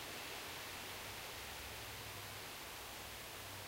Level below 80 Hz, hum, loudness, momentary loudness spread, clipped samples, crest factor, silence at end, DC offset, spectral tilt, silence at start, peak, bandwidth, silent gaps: -66 dBFS; none; -47 LUFS; 2 LU; under 0.1%; 14 dB; 0 s; under 0.1%; -2 dB/octave; 0 s; -34 dBFS; 16 kHz; none